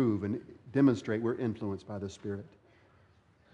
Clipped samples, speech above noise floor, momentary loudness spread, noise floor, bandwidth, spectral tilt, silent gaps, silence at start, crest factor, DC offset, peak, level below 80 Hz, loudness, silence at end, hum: under 0.1%; 33 dB; 14 LU; -64 dBFS; 8.6 kHz; -8 dB/octave; none; 0 s; 18 dB; under 0.1%; -14 dBFS; -70 dBFS; -33 LUFS; 1.05 s; none